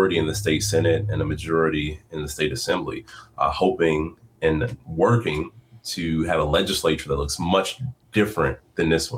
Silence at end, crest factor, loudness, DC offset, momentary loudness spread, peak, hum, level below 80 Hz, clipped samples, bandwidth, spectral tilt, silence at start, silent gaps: 0 s; 16 dB; -23 LUFS; under 0.1%; 11 LU; -8 dBFS; none; -42 dBFS; under 0.1%; 16.5 kHz; -5 dB/octave; 0 s; none